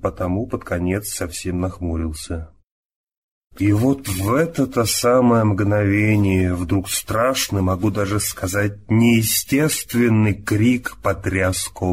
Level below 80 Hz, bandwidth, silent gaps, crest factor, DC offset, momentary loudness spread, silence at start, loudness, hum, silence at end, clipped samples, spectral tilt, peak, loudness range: -40 dBFS; 16 kHz; 2.64-2.90 s, 2.96-3.07 s, 3.17-3.42 s; 14 dB; 0.3%; 9 LU; 0 s; -19 LUFS; none; 0 s; under 0.1%; -5 dB/octave; -6 dBFS; 6 LU